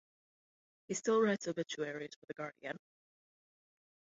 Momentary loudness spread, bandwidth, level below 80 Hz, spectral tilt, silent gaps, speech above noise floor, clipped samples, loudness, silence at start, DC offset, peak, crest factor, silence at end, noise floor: 15 LU; 7.6 kHz; -84 dBFS; -4 dB/octave; 2.16-2.22 s; over 53 dB; under 0.1%; -38 LUFS; 0.9 s; under 0.1%; -20 dBFS; 20 dB; 1.4 s; under -90 dBFS